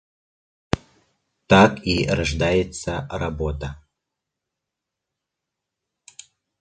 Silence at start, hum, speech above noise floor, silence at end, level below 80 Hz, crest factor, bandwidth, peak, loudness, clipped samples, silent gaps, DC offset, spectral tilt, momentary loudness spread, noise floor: 0.75 s; none; 64 dB; 2.85 s; -38 dBFS; 24 dB; 9.4 kHz; 0 dBFS; -21 LUFS; under 0.1%; none; under 0.1%; -5.5 dB/octave; 14 LU; -84 dBFS